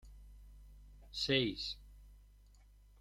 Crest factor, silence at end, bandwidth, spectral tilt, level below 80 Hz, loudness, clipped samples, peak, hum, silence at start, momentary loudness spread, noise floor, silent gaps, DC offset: 24 dB; 0.8 s; 15.5 kHz; -4.5 dB/octave; -58 dBFS; -37 LUFS; under 0.1%; -18 dBFS; 50 Hz at -55 dBFS; 0.05 s; 27 LU; -62 dBFS; none; under 0.1%